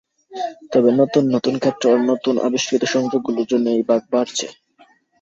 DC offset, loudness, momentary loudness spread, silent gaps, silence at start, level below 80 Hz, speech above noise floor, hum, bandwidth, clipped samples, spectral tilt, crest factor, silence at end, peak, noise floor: under 0.1%; -18 LUFS; 11 LU; none; 0.3 s; -64 dBFS; 36 dB; none; 7.8 kHz; under 0.1%; -4.5 dB/octave; 16 dB; 0.7 s; -2 dBFS; -54 dBFS